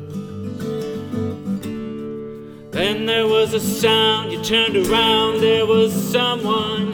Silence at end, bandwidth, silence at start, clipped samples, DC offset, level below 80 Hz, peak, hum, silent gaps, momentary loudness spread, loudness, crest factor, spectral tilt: 0 s; 19.5 kHz; 0 s; under 0.1%; under 0.1%; -48 dBFS; -4 dBFS; none; none; 14 LU; -18 LUFS; 16 dB; -4 dB/octave